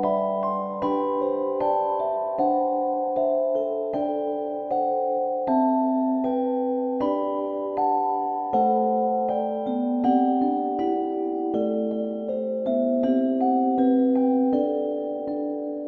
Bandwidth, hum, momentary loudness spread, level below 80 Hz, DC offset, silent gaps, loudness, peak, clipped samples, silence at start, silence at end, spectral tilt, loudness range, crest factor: 4.5 kHz; none; 6 LU; -66 dBFS; under 0.1%; none; -24 LUFS; -10 dBFS; under 0.1%; 0 s; 0 s; -10 dB/octave; 2 LU; 14 dB